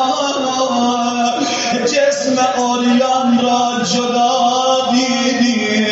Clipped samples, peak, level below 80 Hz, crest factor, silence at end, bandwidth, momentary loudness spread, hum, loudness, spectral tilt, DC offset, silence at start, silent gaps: under 0.1%; -2 dBFS; -62 dBFS; 12 dB; 0 s; 8 kHz; 3 LU; none; -14 LUFS; -2 dB/octave; under 0.1%; 0 s; none